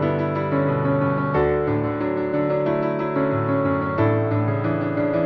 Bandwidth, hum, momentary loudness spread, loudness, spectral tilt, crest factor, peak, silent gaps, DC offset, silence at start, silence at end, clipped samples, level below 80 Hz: 5.6 kHz; none; 3 LU; -22 LUFS; -11 dB/octave; 14 dB; -8 dBFS; none; under 0.1%; 0 s; 0 s; under 0.1%; -46 dBFS